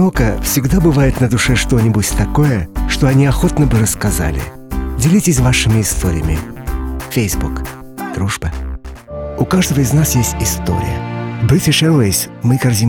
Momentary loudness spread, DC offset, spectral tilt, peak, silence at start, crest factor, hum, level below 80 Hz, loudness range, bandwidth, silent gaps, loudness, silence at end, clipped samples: 13 LU; under 0.1%; -5 dB/octave; -2 dBFS; 0 s; 12 dB; none; -24 dBFS; 6 LU; 18.5 kHz; none; -14 LUFS; 0 s; under 0.1%